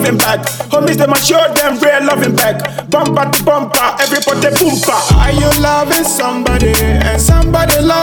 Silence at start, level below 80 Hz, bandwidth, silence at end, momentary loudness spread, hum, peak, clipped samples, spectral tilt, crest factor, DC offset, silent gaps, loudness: 0 s; -18 dBFS; over 20 kHz; 0 s; 4 LU; none; 0 dBFS; under 0.1%; -4 dB/octave; 10 dB; under 0.1%; none; -11 LUFS